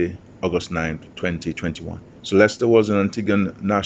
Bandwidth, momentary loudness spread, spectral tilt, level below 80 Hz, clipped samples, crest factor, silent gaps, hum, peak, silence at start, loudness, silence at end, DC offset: 8.4 kHz; 12 LU; -6 dB/octave; -50 dBFS; under 0.1%; 20 dB; none; none; -2 dBFS; 0 s; -21 LUFS; 0 s; under 0.1%